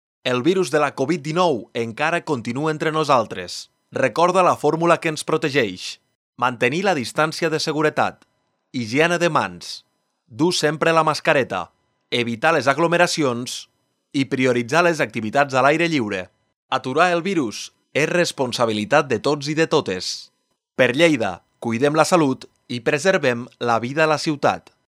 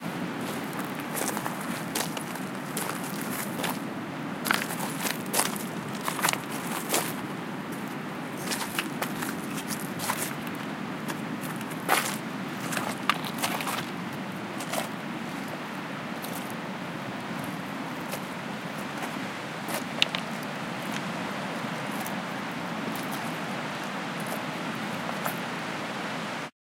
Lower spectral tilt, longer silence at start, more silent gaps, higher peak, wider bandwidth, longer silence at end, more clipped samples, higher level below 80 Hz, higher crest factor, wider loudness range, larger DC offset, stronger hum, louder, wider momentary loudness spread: about the same, -4.5 dB/octave vs -3.5 dB/octave; first, 0.25 s vs 0 s; first, 6.15-6.33 s, 16.56-16.69 s vs none; about the same, 0 dBFS vs 0 dBFS; second, 14.5 kHz vs 17 kHz; about the same, 0.3 s vs 0.25 s; neither; about the same, -68 dBFS vs -72 dBFS; second, 20 dB vs 32 dB; second, 2 LU vs 5 LU; neither; neither; first, -20 LUFS vs -31 LUFS; first, 12 LU vs 8 LU